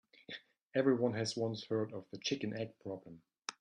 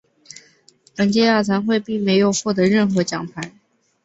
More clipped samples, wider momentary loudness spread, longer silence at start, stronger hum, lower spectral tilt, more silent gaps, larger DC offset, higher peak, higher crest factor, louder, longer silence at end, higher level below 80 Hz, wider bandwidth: neither; about the same, 17 LU vs 15 LU; second, 0.3 s vs 1 s; neither; about the same, -5 dB/octave vs -5 dB/octave; first, 0.62-0.66 s vs none; neither; second, -18 dBFS vs -2 dBFS; about the same, 20 dB vs 16 dB; second, -38 LUFS vs -18 LUFS; second, 0.1 s vs 0.55 s; second, -78 dBFS vs -58 dBFS; first, 10.5 kHz vs 8.2 kHz